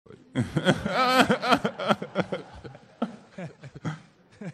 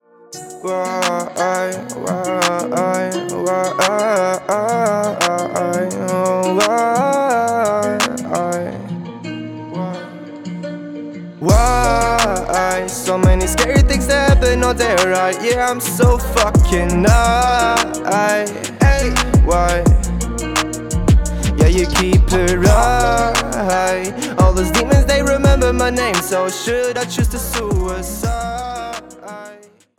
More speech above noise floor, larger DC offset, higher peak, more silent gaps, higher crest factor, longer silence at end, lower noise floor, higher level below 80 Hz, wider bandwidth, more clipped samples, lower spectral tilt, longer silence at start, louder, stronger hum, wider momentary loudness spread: about the same, 24 dB vs 27 dB; neither; about the same, -4 dBFS vs -4 dBFS; neither; first, 22 dB vs 12 dB; second, 0 s vs 0.45 s; first, -47 dBFS vs -42 dBFS; second, -56 dBFS vs -22 dBFS; second, 14 kHz vs 18.5 kHz; neither; about the same, -5 dB/octave vs -5 dB/octave; second, 0.1 s vs 0.3 s; second, -26 LUFS vs -16 LUFS; neither; first, 21 LU vs 14 LU